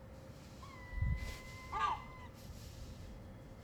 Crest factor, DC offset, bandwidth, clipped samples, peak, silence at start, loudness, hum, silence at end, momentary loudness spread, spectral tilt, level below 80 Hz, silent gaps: 20 dB; under 0.1%; 20 kHz; under 0.1%; -24 dBFS; 0 s; -45 LUFS; none; 0 s; 16 LU; -5.5 dB/octave; -48 dBFS; none